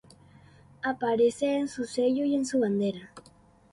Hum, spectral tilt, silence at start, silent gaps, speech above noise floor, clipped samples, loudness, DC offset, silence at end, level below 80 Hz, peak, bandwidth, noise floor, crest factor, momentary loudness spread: none; -5.5 dB/octave; 0.85 s; none; 31 dB; under 0.1%; -28 LUFS; under 0.1%; 0.55 s; -66 dBFS; -14 dBFS; 11.5 kHz; -58 dBFS; 14 dB; 8 LU